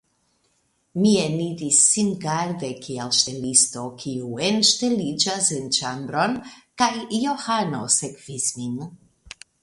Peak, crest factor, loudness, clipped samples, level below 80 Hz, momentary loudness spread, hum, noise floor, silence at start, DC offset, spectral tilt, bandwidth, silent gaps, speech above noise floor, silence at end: -2 dBFS; 22 dB; -21 LUFS; under 0.1%; -62 dBFS; 14 LU; none; -68 dBFS; 0.95 s; under 0.1%; -2.5 dB/octave; 11.5 kHz; none; 45 dB; 0.35 s